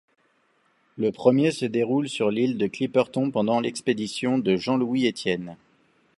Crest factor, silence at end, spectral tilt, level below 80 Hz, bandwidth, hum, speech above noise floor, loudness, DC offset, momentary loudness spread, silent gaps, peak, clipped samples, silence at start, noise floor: 20 dB; 0.65 s; -6 dB/octave; -66 dBFS; 11.5 kHz; none; 42 dB; -24 LUFS; under 0.1%; 7 LU; none; -4 dBFS; under 0.1%; 0.95 s; -66 dBFS